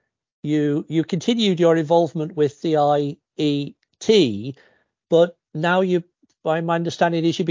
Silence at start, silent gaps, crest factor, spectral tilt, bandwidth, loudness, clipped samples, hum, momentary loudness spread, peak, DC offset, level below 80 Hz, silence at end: 0.45 s; none; 16 dB; -6 dB/octave; 7.6 kHz; -20 LUFS; under 0.1%; none; 10 LU; -4 dBFS; under 0.1%; -66 dBFS; 0 s